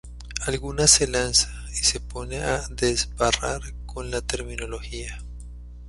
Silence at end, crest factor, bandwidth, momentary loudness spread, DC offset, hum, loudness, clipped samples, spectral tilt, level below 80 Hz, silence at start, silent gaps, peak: 0 s; 24 dB; 12 kHz; 19 LU; under 0.1%; 60 Hz at -35 dBFS; -23 LUFS; under 0.1%; -2 dB/octave; -36 dBFS; 0.05 s; none; 0 dBFS